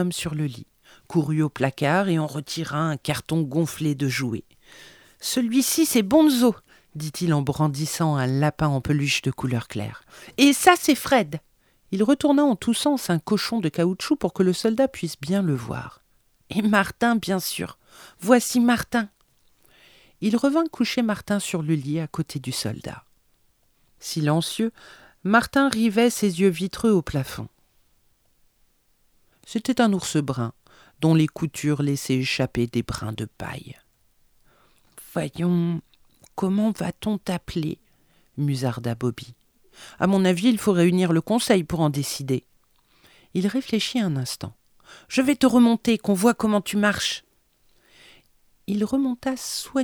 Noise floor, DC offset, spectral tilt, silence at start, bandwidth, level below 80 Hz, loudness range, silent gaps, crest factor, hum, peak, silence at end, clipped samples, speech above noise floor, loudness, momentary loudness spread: -64 dBFS; under 0.1%; -5 dB/octave; 0 s; over 20 kHz; -54 dBFS; 6 LU; none; 24 dB; none; 0 dBFS; 0 s; under 0.1%; 41 dB; -23 LUFS; 13 LU